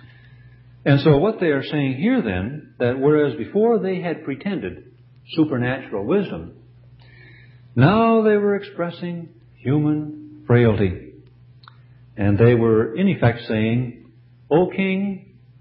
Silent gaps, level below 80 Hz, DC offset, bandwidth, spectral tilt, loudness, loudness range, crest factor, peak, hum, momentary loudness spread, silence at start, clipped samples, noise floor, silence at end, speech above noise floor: none; -46 dBFS; under 0.1%; 5.6 kHz; -12.5 dB/octave; -20 LUFS; 4 LU; 18 dB; -2 dBFS; none; 15 LU; 0.05 s; under 0.1%; -49 dBFS; 0.45 s; 30 dB